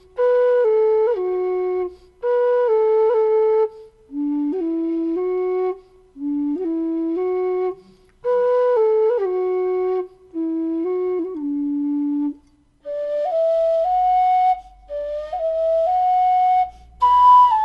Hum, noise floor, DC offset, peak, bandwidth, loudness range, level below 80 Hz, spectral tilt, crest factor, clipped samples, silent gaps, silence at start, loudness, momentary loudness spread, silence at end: none; -53 dBFS; under 0.1%; -6 dBFS; 6.4 kHz; 5 LU; -54 dBFS; -6.5 dB/octave; 14 dB; under 0.1%; none; 0.15 s; -19 LUFS; 11 LU; 0 s